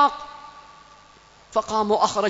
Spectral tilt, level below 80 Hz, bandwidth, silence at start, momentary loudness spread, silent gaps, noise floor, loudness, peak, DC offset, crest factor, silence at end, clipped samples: -3.5 dB/octave; -58 dBFS; 8 kHz; 0 s; 23 LU; none; -51 dBFS; -23 LUFS; -6 dBFS; under 0.1%; 18 dB; 0 s; under 0.1%